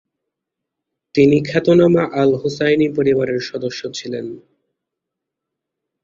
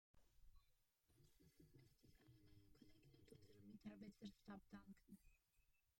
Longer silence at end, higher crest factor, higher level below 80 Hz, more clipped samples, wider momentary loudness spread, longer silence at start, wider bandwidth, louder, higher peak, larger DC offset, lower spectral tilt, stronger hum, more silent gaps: first, 1.65 s vs 0.05 s; about the same, 16 dB vs 20 dB; first, -54 dBFS vs -78 dBFS; neither; first, 13 LU vs 7 LU; first, 1.15 s vs 0.15 s; second, 7.6 kHz vs 16 kHz; first, -16 LUFS vs -63 LUFS; first, -2 dBFS vs -46 dBFS; neither; about the same, -6.5 dB/octave vs -6 dB/octave; neither; neither